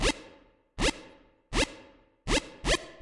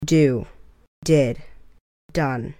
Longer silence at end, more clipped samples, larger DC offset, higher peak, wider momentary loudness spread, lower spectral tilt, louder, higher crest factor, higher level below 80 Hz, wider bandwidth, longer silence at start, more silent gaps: about the same, 0.1 s vs 0.1 s; neither; neither; second, -12 dBFS vs -4 dBFS; first, 19 LU vs 16 LU; second, -3 dB/octave vs -6.5 dB/octave; second, -31 LUFS vs -21 LUFS; about the same, 20 dB vs 18 dB; first, -38 dBFS vs -44 dBFS; second, 11.5 kHz vs 16 kHz; about the same, 0 s vs 0 s; second, none vs 0.88-1.02 s, 1.81-2.09 s